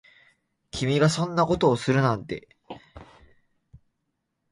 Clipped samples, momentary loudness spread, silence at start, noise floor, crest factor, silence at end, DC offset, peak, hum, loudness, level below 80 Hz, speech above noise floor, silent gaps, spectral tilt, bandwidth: under 0.1%; 22 LU; 0.75 s; -78 dBFS; 20 dB; 1.5 s; under 0.1%; -6 dBFS; none; -23 LUFS; -54 dBFS; 55 dB; none; -6 dB/octave; 11.5 kHz